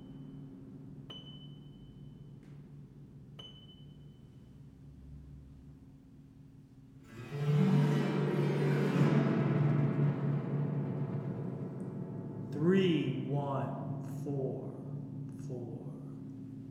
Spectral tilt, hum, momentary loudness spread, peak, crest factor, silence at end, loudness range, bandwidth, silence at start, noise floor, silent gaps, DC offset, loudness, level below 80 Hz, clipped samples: -8.5 dB/octave; none; 25 LU; -16 dBFS; 18 dB; 0 s; 22 LU; 8.4 kHz; 0 s; -56 dBFS; none; under 0.1%; -34 LUFS; -64 dBFS; under 0.1%